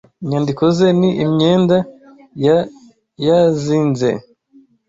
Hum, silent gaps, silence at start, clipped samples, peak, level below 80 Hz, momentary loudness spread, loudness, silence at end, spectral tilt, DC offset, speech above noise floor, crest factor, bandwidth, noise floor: none; none; 0.2 s; under 0.1%; -2 dBFS; -52 dBFS; 8 LU; -15 LUFS; 0.7 s; -7.5 dB/octave; under 0.1%; 36 dB; 14 dB; 7.8 kHz; -50 dBFS